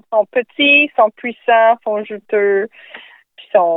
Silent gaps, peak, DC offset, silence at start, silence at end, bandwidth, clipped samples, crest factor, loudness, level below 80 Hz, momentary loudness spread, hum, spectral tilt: none; 0 dBFS; under 0.1%; 0.1 s; 0 s; 4 kHz; under 0.1%; 14 dB; -14 LUFS; -80 dBFS; 12 LU; none; -7 dB/octave